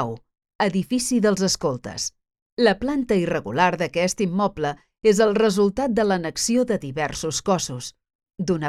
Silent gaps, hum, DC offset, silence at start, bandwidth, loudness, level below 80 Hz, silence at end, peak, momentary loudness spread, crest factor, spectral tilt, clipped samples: 0.55-0.59 s, 2.42-2.57 s, 8.15-8.19 s; none; under 0.1%; 0 s; 14.5 kHz; -22 LUFS; -50 dBFS; 0 s; -4 dBFS; 10 LU; 18 dB; -4.5 dB/octave; under 0.1%